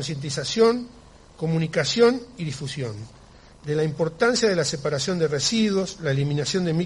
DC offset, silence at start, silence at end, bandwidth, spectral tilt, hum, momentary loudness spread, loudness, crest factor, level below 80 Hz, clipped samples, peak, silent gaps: under 0.1%; 0 s; 0 s; 11.5 kHz; -4.5 dB/octave; none; 12 LU; -23 LUFS; 18 dB; -52 dBFS; under 0.1%; -6 dBFS; none